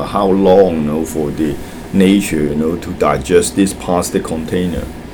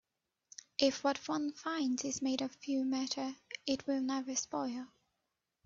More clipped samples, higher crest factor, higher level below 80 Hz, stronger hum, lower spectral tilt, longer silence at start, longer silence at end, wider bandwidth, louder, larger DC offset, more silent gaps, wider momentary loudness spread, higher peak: neither; second, 14 dB vs 24 dB; first, -34 dBFS vs -76 dBFS; neither; first, -5.5 dB/octave vs -2.5 dB/octave; second, 0 s vs 0.8 s; second, 0 s vs 0.8 s; first, 20 kHz vs 7.8 kHz; first, -14 LUFS vs -36 LUFS; neither; neither; about the same, 9 LU vs 10 LU; first, 0 dBFS vs -14 dBFS